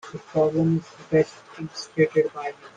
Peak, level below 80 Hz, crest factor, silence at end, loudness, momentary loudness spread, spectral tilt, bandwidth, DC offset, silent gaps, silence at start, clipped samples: -8 dBFS; -60 dBFS; 16 dB; 0.1 s; -24 LUFS; 13 LU; -7 dB/octave; 9.2 kHz; under 0.1%; none; 0.05 s; under 0.1%